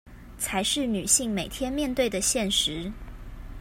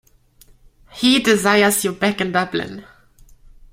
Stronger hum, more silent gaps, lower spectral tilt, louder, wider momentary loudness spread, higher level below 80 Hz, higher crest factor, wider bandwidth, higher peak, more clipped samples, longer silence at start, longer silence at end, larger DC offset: neither; neither; about the same, -2.5 dB/octave vs -3.5 dB/octave; second, -25 LUFS vs -17 LUFS; first, 21 LU vs 12 LU; first, -44 dBFS vs -50 dBFS; about the same, 22 dB vs 20 dB; about the same, 16 kHz vs 16.5 kHz; second, -6 dBFS vs 0 dBFS; neither; second, 0.05 s vs 0.95 s; second, 0 s vs 0.9 s; neither